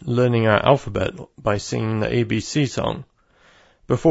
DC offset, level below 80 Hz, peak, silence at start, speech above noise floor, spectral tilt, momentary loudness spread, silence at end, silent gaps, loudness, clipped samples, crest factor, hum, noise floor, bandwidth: under 0.1%; -46 dBFS; -2 dBFS; 0 s; 35 dB; -6 dB/octave; 10 LU; 0 s; none; -21 LUFS; under 0.1%; 20 dB; none; -55 dBFS; 8 kHz